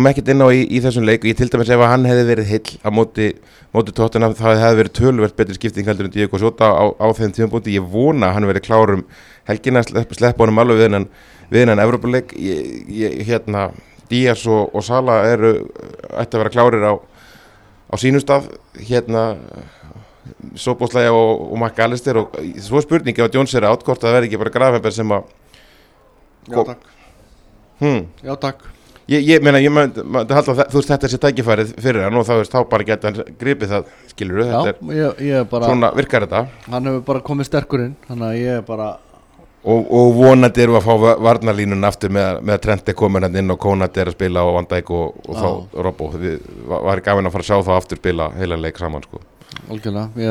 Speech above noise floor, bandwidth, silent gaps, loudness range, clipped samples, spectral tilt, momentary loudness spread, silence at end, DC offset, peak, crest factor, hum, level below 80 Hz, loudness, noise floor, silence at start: 35 dB; 13 kHz; none; 6 LU; under 0.1%; -7 dB/octave; 12 LU; 0 s; under 0.1%; 0 dBFS; 16 dB; none; -42 dBFS; -16 LUFS; -50 dBFS; 0 s